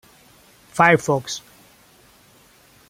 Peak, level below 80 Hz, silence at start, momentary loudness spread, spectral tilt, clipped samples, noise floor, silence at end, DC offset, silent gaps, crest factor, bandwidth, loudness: -2 dBFS; -62 dBFS; 0.75 s; 17 LU; -4.5 dB/octave; under 0.1%; -53 dBFS; 1.5 s; under 0.1%; none; 22 dB; 16.5 kHz; -19 LUFS